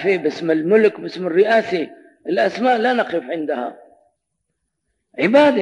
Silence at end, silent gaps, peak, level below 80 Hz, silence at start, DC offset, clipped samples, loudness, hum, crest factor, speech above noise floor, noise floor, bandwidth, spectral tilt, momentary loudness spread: 0 s; none; -2 dBFS; -72 dBFS; 0 s; under 0.1%; under 0.1%; -18 LUFS; none; 16 dB; 58 dB; -75 dBFS; 10 kHz; -6 dB/octave; 12 LU